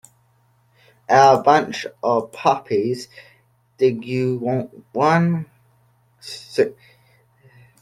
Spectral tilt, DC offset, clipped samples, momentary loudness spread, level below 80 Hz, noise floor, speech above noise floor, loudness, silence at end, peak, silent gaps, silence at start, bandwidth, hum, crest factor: -6 dB/octave; under 0.1%; under 0.1%; 21 LU; -62 dBFS; -60 dBFS; 41 dB; -19 LUFS; 1.1 s; -2 dBFS; none; 1.1 s; 13.5 kHz; none; 20 dB